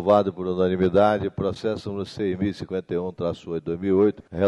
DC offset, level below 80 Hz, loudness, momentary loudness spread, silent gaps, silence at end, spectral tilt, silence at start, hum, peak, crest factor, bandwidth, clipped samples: under 0.1%; -52 dBFS; -24 LUFS; 10 LU; none; 0 s; -8 dB/octave; 0 s; none; -4 dBFS; 18 dB; 11 kHz; under 0.1%